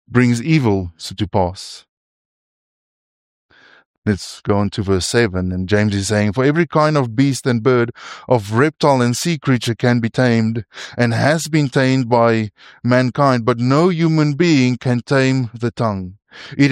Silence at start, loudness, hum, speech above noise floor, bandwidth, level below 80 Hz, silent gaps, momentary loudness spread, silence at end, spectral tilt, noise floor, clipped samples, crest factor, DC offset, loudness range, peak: 0.1 s; -17 LUFS; none; over 74 dB; 15.5 kHz; -48 dBFS; 1.89-3.49 s, 3.86-4.02 s; 9 LU; 0 s; -6 dB/octave; under -90 dBFS; under 0.1%; 16 dB; under 0.1%; 8 LU; -2 dBFS